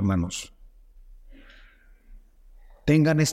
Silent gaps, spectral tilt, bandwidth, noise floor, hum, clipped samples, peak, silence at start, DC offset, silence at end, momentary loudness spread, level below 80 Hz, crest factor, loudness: none; -5.5 dB/octave; 14 kHz; -53 dBFS; none; under 0.1%; -8 dBFS; 0 s; under 0.1%; 0 s; 16 LU; -46 dBFS; 20 dB; -24 LUFS